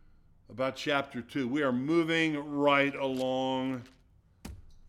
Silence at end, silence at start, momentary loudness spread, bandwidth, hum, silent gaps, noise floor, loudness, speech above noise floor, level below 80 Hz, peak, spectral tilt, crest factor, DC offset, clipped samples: 0 s; 0.5 s; 23 LU; 14.5 kHz; none; none; -58 dBFS; -30 LUFS; 29 dB; -60 dBFS; -12 dBFS; -5.5 dB/octave; 18 dB; under 0.1%; under 0.1%